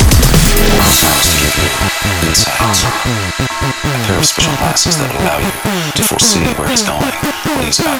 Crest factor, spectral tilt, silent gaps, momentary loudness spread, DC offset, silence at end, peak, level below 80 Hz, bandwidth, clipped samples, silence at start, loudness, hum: 12 dB; -3 dB/octave; none; 7 LU; under 0.1%; 0 s; 0 dBFS; -20 dBFS; over 20 kHz; under 0.1%; 0 s; -11 LUFS; none